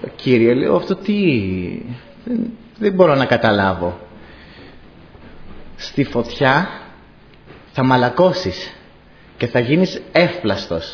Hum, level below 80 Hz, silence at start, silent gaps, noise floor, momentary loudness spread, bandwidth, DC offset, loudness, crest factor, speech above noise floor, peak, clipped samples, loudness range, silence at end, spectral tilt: none; -46 dBFS; 0 s; none; -45 dBFS; 16 LU; 5.4 kHz; under 0.1%; -17 LUFS; 18 dB; 28 dB; 0 dBFS; under 0.1%; 5 LU; 0 s; -7 dB/octave